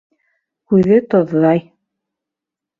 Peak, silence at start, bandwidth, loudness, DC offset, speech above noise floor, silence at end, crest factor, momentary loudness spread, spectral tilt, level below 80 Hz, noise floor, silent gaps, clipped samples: -2 dBFS; 0.7 s; 5.2 kHz; -14 LUFS; under 0.1%; 72 dB; 1.2 s; 16 dB; 4 LU; -10 dB/octave; -54 dBFS; -85 dBFS; none; under 0.1%